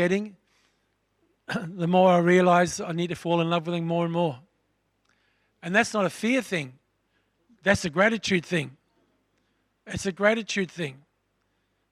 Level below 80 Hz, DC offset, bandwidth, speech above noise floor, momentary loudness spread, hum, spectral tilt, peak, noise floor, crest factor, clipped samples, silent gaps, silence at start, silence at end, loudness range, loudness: -62 dBFS; under 0.1%; 13 kHz; 49 dB; 16 LU; none; -5.5 dB/octave; -6 dBFS; -73 dBFS; 22 dB; under 0.1%; none; 0 s; 0.95 s; 6 LU; -25 LUFS